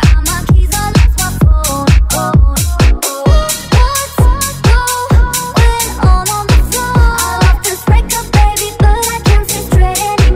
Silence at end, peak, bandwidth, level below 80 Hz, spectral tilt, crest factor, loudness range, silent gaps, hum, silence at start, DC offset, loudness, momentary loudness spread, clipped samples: 0 s; 0 dBFS; 16.5 kHz; -12 dBFS; -4.5 dB/octave; 10 dB; 1 LU; none; none; 0 s; 0.2%; -11 LUFS; 2 LU; 0.3%